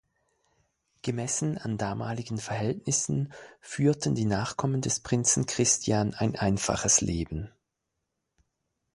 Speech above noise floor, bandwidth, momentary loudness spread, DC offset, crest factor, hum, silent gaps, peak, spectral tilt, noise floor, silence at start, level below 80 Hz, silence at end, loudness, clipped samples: 55 dB; 11.5 kHz; 11 LU; under 0.1%; 20 dB; none; none; -10 dBFS; -4 dB/octave; -83 dBFS; 1.05 s; -50 dBFS; 1.45 s; -28 LUFS; under 0.1%